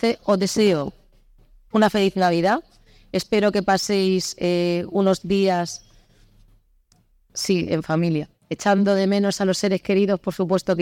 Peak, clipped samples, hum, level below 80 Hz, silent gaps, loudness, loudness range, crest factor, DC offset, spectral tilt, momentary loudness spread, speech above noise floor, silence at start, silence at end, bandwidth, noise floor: -4 dBFS; under 0.1%; none; -54 dBFS; none; -21 LUFS; 4 LU; 18 dB; under 0.1%; -5.5 dB/octave; 8 LU; 40 dB; 0 s; 0 s; 17 kHz; -60 dBFS